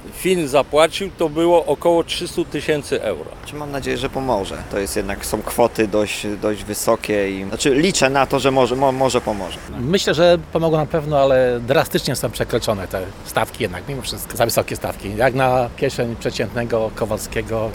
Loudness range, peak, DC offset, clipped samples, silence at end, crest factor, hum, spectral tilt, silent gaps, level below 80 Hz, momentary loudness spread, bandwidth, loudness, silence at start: 5 LU; 0 dBFS; under 0.1%; under 0.1%; 0 s; 18 dB; none; -4.5 dB/octave; none; -40 dBFS; 10 LU; over 20 kHz; -19 LUFS; 0 s